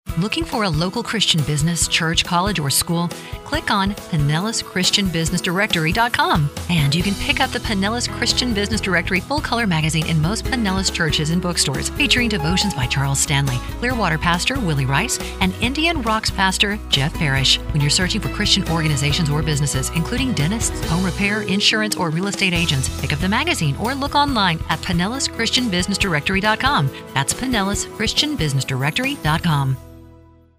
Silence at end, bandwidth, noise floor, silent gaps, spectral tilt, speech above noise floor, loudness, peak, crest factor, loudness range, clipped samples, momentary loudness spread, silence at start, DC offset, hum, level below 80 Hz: 0.5 s; 16 kHz; -47 dBFS; none; -3.5 dB/octave; 28 dB; -18 LUFS; -2 dBFS; 18 dB; 2 LU; under 0.1%; 5 LU; 0.05 s; under 0.1%; none; -32 dBFS